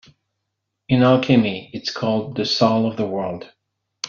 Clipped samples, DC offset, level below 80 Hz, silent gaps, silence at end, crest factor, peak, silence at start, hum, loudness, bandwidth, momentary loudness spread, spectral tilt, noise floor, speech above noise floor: under 0.1%; under 0.1%; -58 dBFS; none; 0 s; 18 dB; -2 dBFS; 0.9 s; none; -19 LUFS; 7.2 kHz; 12 LU; -5 dB/octave; -78 dBFS; 59 dB